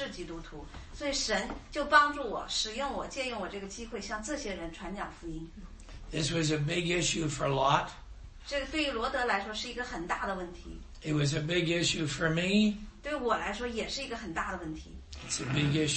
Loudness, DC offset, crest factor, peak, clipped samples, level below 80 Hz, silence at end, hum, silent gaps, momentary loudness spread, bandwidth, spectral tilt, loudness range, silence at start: -32 LUFS; under 0.1%; 24 dB; -8 dBFS; under 0.1%; -48 dBFS; 0 s; none; none; 17 LU; 8.8 kHz; -4 dB/octave; 6 LU; 0 s